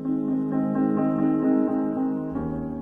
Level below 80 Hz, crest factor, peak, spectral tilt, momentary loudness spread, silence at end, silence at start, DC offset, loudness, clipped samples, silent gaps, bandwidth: -50 dBFS; 14 dB; -10 dBFS; -11.5 dB/octave; 7 LU; 0 s; 0 s; under 0.1%; -24 LUFS; under 0.1%; none; 2.8 kHz